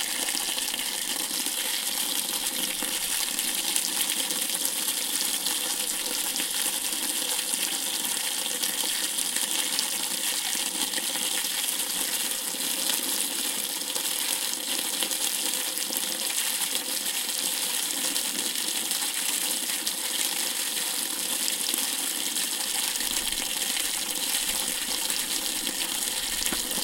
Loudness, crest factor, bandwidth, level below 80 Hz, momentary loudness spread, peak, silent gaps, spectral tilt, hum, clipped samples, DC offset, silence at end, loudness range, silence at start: -25 LUFS; 28 dB; 17 kHz; -60 dBFS; 2 LU; -2 dBFS; none; 1.5 dB/octave; none; under 0.1%; under 0.1%; 0 s; 1 LU; 0 s